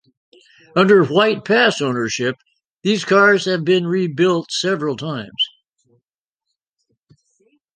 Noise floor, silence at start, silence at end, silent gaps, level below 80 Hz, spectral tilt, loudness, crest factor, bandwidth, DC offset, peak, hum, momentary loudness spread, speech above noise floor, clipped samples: -82 dBFS; 0.75 s; 2.3 s; 2.71-2.76 s; -64 dBFS; -5 dB/octave; -17 LUFS; 18 dB; 9.8 kHz; under 0.1%; 0 dBFS; none; 11 LU; 66 dB; under 0.1%